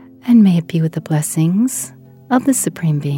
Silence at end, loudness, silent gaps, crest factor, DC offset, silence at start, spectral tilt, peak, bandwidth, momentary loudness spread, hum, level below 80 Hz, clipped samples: 0 s; -15 LUFS; none; 16 dB; under 0.1%; 0.25 s; -6 dB/octave; 0 dBFS; 17 kHz; 8 LU; none; -64 dBFS; under 0.1%